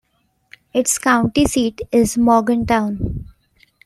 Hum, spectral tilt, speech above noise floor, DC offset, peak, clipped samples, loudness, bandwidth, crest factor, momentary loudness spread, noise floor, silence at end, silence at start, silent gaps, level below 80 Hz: none; -4.5 dB/octave; 46 dB; under 0.1%; -2 dBFS; under 0.1%; -17 LUFS; 15.5 kHz; 16 dB; 9 LU; -63 dBFS; 0.6 s; 0.75 s; none; -38 dBFS